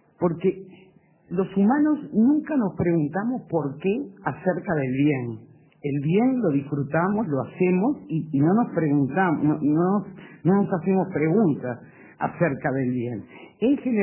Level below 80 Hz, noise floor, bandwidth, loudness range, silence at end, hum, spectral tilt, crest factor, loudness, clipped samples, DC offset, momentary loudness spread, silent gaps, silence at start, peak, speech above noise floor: -58 dBFS; -55 dBFS; 3.2 kHz; 3 LU; 0 s; none; -12.5 dB/octave; 16 dB; -24 LUFS; under 0.1%; under 0.1%; 9 LU; none; 0.2 s; -8 dBFS; 32 dB